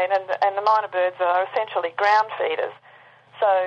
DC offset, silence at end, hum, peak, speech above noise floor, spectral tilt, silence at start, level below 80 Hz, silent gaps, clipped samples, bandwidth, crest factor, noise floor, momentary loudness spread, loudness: under 0.1%; 0 s; 50 Hz at -65 dBFS; -6 dBFS; 29 dB; -3.5 dB/octave; 0 s; -82 dBFS; none; under 0.1%; 7.8 kHz; 16 dB; -50 dBFS; 6 LU; -22 LUFS